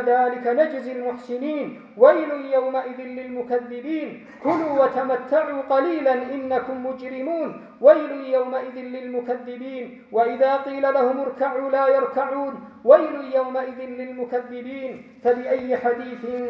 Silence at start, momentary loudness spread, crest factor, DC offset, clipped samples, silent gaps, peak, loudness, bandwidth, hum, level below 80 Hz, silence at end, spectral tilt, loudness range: 0 s; 16 LU; 22 dB; under 0.1%; under 0.1%; none; 0 dBFS; -22 LUFS; 5.8 kHz; none; -70 dBFS; 0 s; -7 dB/octave; 3 LU